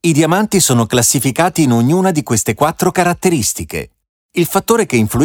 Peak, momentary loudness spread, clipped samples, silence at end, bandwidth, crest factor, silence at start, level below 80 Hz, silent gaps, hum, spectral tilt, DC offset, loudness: 0 dBFS; 8 LU; under 0.1%; 0 s; 19.5 kHz; 12 dB; 0.05 s; -42 dBFS; 4.09-4.29 s; none; -4.5 dB/octave; under 0.1%; -13 LUFS